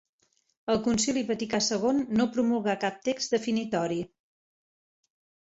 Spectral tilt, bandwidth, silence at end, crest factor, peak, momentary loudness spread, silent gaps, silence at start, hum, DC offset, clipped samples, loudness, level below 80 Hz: -4 dB/octave; 8.2 kHz; 1.35 s; 16 dB; -12 dBFS; 6 LU; none; 0.65 s; none; under 0.1%; under 0.1%; -28 LUFS; -64 dBFS